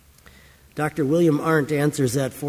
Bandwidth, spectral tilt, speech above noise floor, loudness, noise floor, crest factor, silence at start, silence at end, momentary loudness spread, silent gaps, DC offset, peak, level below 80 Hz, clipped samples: 16 kHz; -6.5 dB/octave; 29 dB; -21 LUFS; -50 dBFS; 16 dB; 0.75 s; 0 s; 9 LU; none; under 0.1%; -8 dBFS; -54 dBFS; under 0.1%